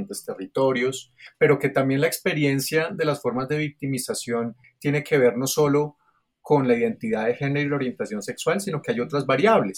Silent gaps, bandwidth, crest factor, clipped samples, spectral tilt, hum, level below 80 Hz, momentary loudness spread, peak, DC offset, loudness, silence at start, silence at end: none; 18 kHz; 18 dB; under 0.1%; -5.5 dB/octave; none; -64 dBFS; 9 LU; -6 dBFS; under 0.1%; -23 LUFS; 0 s; 0 s